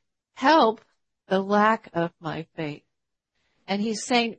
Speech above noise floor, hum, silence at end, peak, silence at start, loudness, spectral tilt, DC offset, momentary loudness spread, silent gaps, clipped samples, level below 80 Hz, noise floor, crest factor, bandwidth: 59 dB; none; 0.05 s; -6 dBFS; 0.35 s; -24 LUFS; -4.5 dB/octave; under 0.1%; 15 LU; none; under 0.1%; -70 dBFS; -82 dBFS; 18 dB; 8.8 kHz